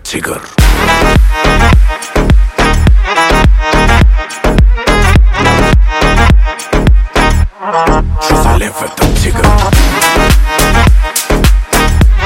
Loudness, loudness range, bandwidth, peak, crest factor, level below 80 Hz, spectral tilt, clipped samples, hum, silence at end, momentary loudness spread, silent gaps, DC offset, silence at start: -9 LUFS; 2 LU; 17 kHz; 0 dBFS; 8 dB; -10 dBFS; -5 dB/octave; 2%; none; 0 s; 5 LU; none; under 0.1%; 0.05 s